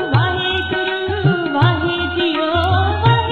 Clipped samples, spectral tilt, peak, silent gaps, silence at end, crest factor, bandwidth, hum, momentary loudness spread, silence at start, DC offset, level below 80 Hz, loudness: under 0.1%; -8 dB/octave; -2 dBFS; none; 0 s; 14 dB; 6.6 kHz; none; 4 LU; 0 s; 0.3%; -30 dBFS; -17 LUFS